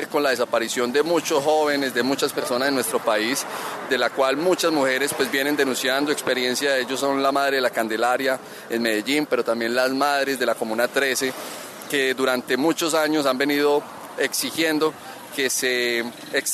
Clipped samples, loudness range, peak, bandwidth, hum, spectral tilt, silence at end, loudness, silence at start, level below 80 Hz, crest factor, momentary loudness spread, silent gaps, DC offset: under 0.1%; 1 LU; -6 dBFS; 14 kHz; none; -2.5 dB/octave; 0 s; -22 LUFS; 0 s; -74 dBFS; 16 dB; 5 LU; none; under 0.1%